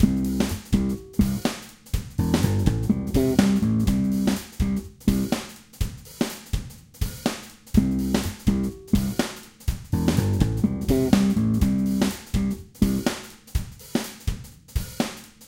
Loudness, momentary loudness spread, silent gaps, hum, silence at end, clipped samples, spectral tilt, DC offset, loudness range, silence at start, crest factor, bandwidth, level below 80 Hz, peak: -25 LUFS; 11 LU; none; none; 0.05 s; under 0.1%; -6 dB/octave; under 0.1%; 5 LU; 0 s; 22 dB; 17 kHz; -34 dBFS; -2 dBFS